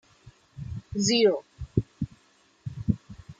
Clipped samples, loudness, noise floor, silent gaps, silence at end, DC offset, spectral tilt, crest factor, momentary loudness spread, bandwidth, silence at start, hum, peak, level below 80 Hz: under 0.1%; -27 LUFS; -63 dBFS; none; 0.1 s; under 0.1%; -5 dB/octave; 22 dB; 19 LU; 9.6 kHz; 0.25 s; none; -8 dBFS; -48 dBFS